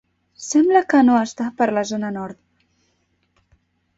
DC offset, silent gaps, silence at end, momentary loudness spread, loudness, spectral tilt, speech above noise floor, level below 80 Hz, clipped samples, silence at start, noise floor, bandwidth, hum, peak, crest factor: under 0.1%; none; 1.65 s; 16 LU; -18 LUFS; -4.5 dB/octave; 49 dB; -62 dBFS; under 0.1%; 0.4 s; -67 dBFS; 8 kHz; none; -4 dBFS; 18 dB